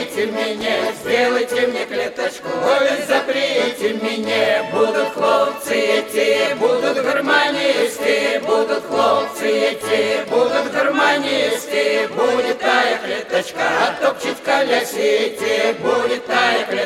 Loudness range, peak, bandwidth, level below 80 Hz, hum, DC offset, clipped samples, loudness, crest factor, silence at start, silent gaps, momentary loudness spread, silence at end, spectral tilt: 2 LU; -2 dBFS; 16.5 kHz; -60 dBFS; none; under 0.1%; under 0.1%; -17 LUFS; 16 dB; 0 s; none; 5 LU; 0 s; -3 dB/octave